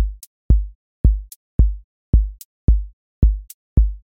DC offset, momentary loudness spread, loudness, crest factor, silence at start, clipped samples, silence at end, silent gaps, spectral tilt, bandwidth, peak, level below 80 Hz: under 0.1%; 12 LU; -21 LUFS; 16 dB; 0 s; under 0.1%; 0.2 s; 0.27-0.49 s, 0.75-1.04 s, 1.36-1.59 s, 1.84-2.13 s, 2.45-2.68 s, 2.93-3.22 s, 3.54-3.76 s; -9 dB/octave; 15 kHz; -2 dBFS; -18 dBFS